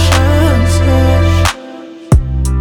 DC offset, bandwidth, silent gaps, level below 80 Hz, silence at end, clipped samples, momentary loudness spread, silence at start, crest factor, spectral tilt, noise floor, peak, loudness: under 0.1%; 15 kHz; none; -16 dBFS; 0 s; under 0.1%; 14 LU; 0 s; 10 dB; -5.5 dB/octave; -29 dBFS; 0 dBFS; -11 LUFS